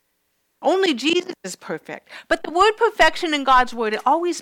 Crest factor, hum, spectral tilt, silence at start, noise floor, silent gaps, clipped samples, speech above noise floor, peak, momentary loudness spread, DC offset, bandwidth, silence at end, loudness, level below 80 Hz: 14 dB; none; -2.5 dB/octave; 0.6 s; -70 dBFS; none; under 0.1%; 50 dB; -6 dBFS; 15 LU; under 0.1%; 16.5 kHz; 0 s; -19 LUFS; -46 dBFS